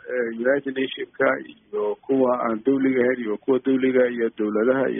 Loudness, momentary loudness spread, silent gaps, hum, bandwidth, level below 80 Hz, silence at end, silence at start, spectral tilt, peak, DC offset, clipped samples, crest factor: -22 LUFS; 7 LU; none; none; 3.8 kHz; -66 dBFS; 0 s; 0.05 s; -1.5 dB/octave; -6 dBFS; under 0.1%; under 0.1%; 16 dB